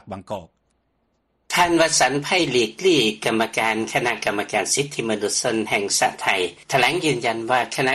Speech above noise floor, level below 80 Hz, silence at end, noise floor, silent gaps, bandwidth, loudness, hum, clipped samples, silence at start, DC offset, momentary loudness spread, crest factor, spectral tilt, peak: 48 dB; -58 dBFS; 0 s; -69 dBFS; none; 13 kHz; -20 LUFS; none; under 0.1%; 0.05 s; under 0.1%; 7 LU; 16 dB; -2.5 dB/octave; -6 dBFS